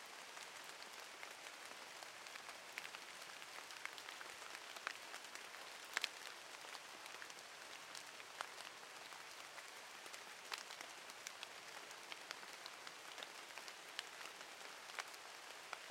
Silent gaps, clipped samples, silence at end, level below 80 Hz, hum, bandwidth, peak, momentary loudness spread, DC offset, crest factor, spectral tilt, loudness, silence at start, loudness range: none; under 0.1%; 0 s; under -90 dBFS; none; 16.5 kHz; -18 dBFS; 4 LU; under 0.1%; 36 dB; 0.5 dB/octave; -51 LUFS; 0 s; 3 LU